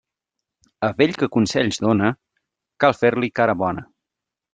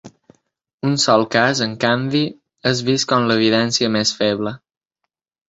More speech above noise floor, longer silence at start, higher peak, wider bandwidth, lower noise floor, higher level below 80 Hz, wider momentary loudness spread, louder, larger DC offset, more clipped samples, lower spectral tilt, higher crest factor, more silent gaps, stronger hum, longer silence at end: first, 66 dB vs 61 dB; first, 0.8 s vs 0.05 s; about the same, -2 dBFS vs -2 dBFS; first, 9.4 kHz vs 8 kHz; first, -85 dBFS vs -78 dBFS; about the same, -58 dBFS vs -56 dBFS; about the same, 7 LU vs 9 LU; second, -20 LUFS vs -17 LUFS; neither; neither; first, -5.5 dB/octave vs -4 dB/octave; about the same, 20 dB vs 18 dB; second, none vs 0.74-0.78 s; neither; second, 0.7 s vs 0.9 s